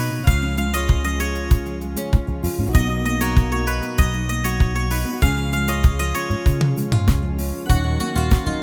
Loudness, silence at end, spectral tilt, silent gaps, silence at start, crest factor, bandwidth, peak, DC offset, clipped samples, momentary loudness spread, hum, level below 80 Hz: -21 LUFS; 0 s; -5.5 dB/octave; none; 0 s; 18 dB; over 20 kHz; -2 dBFS; under 0.1%; under 0.1%; 4 LU; none; -22 dBFS